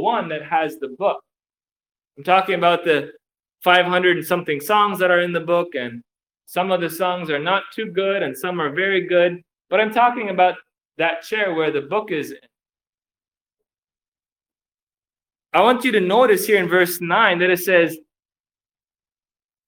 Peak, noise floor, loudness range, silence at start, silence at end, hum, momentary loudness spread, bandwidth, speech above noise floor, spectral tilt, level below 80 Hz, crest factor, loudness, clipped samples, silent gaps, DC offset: 0 dBFS; under -90 dBFS; 8 LU; 0 s; 1.7 s; none; 10 LU; 18 kHz; over 71 dB; -4.5 dB/octave; -70 dBFS; 20 dB; -19 LUFS; under 0.1%; 14.08-14.12 s, 14.32-14.36 s, 14.83-14.87 s; under 0.1%